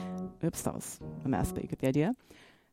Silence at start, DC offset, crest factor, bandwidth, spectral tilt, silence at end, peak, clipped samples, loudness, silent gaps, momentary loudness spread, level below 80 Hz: 0 s; under 0.1%; 18 dB; 16.5 kHz; -6.5 dB/octave; 0.25 s; -16 dBFS; under 0.1%; -34 LUFS; none; 11 LU; -50 dBFS